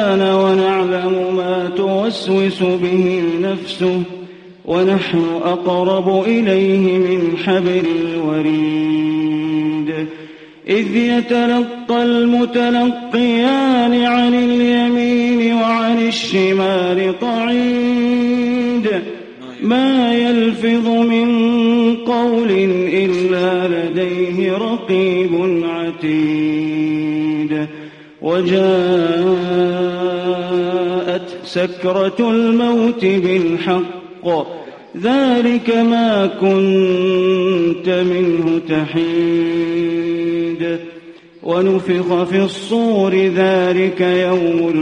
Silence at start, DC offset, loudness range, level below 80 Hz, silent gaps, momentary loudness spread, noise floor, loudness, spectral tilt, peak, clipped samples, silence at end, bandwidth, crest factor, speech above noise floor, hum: 0 s; under 0.1%; 3 LU; -56 dBFS; none; 6 LU; -38 dBFS; -15 LUFS; -7 dB/octave; -2 dBFS; under 0.1%; 0 s; 9.2 kHz; 12 dB; 24 dB; none